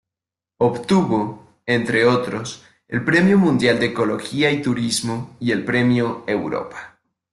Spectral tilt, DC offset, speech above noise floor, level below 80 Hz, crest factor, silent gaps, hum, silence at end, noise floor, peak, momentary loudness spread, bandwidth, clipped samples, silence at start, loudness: -5.5 dB/octave; under 0.1%; 69 dB; -56 dBFS; 18 dB; none; none; 0.45 s; -88 dBFS; -2 dBFS; 13 LU; 12.5 kHz; under 0.1%; 0.6 s; -19 LUFS